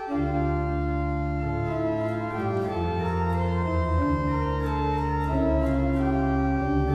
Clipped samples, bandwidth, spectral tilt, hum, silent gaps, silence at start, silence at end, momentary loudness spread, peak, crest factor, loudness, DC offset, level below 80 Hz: under 0.1%; 7.6 kHz; -9 dB/octave; none; none; 0 s; 0 s; 4 LU; -12 dBFS; 12 dB; -26 LUFS; under 0.1%; -32 dBFS